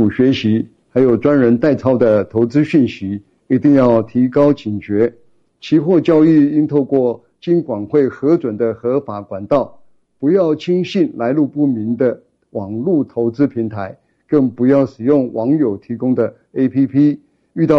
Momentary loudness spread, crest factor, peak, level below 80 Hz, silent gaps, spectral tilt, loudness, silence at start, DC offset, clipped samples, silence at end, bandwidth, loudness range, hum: 10 LU; 12 dB; -2 dBFS; -54 dBFS; none; -9 dB/octave; -15 LUFS; 0 s; under 0.1%; under 0.1%; 0 s; 6.8 kHz; 4 LU; none